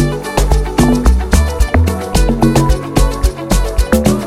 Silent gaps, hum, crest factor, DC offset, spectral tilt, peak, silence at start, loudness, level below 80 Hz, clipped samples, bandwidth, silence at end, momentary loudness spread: none; none; 12 dB; under 0.1%; -6 dB/octave; 0 dBFS; 0 s; -13 LUFS; -14 dBFS; under 0.1%; 15.5 kHz; 0 s; 4 LU